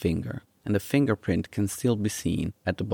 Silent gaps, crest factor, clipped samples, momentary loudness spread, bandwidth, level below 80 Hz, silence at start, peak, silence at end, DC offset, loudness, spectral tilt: none; 18 dB; under 0.1%; 7 LU; 19 kHz; -52 dBFS; 0 s; -10 dBFS; 0 s; under 0.1%; -28 LUFS; -6 dB/octave